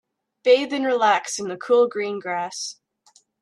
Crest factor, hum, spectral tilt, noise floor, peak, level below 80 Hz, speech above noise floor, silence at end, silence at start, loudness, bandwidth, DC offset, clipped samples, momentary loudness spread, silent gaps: 18 dB; none; -2.5 dB/octave; -59 dBFS; -4 dBFS; -76 dBFS; 38 dB; 0.7 s; 0.45 s; -21 LUFS; 11.5 kHz; under 0.1%; under 0.1%; 10 LU; none